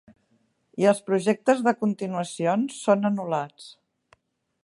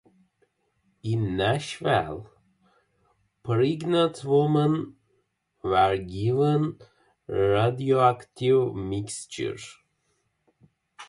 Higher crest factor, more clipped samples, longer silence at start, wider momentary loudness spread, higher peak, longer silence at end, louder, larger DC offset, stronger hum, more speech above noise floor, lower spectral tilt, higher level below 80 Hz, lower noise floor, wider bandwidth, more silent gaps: about the same, 20 dB vs 18 dB; neither; second, 0.75 s vs 1.05 s; second, 8 LU vs 13 LU; about the same, -6 dBFS vs -8 dBFS; first, 0.95 s vs 0.05 s; about the same, -24 LUFS vs -25 LUFS; neither; neither; second, 45 dB vs 49 dB; about the same, -6 dB/octave vs -6.5 dB/octave; second, -76 dBFS vs -54 dBFS; second, -68 dBFS vs -73 dBFS; about the same, 11.5 kHz vs 11.5 kHz; neither